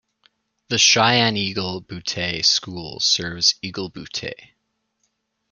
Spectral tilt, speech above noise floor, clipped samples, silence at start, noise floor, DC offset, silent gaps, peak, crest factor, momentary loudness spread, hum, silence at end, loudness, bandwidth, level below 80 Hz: -2 dB/octave; 50 dB; under 0.1%; 0.7 s; -72 dBFS; under 0.1%; none; -2 dBFS; 22 dB; 15 LU; none; 1.05 s; -19 LUFS; 12 kHz; -58 dBFS